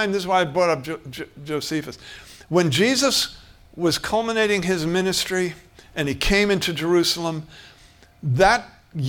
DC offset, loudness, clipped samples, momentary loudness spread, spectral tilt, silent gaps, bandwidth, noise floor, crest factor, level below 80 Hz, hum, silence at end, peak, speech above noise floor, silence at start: under 0.1%; -21 LUFS; under 0.1%; 16 LU; -4 dB/octave; none; 18.5 kHz; -51 dBFS; 20 dB; -42 dBFS; none; 0 s; -2 dBFS; 29 dB; 0 s